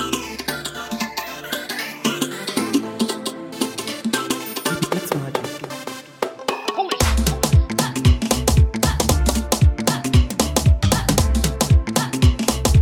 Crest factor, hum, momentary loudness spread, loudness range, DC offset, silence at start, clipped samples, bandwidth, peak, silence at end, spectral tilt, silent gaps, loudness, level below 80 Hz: 18 dB; none; 10 LU; 6 LU; under 0.1%; 0 s; under 0.1%; 17 kHz; -2 dBFS; 0 s; -4.5 dB/octave; none; -20 LUFS; -24 dBFS